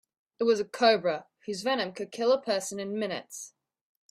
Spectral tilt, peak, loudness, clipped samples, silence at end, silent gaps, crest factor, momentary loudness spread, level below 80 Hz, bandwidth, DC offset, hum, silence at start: -3.5 dB/octave; -10 dBFS; -29 LUFS; under 0.1%; 0.65 s; none; 20 dB; 14 LU; -76 dBFS; 15 kHz; under 0.1%; none; 0.4 s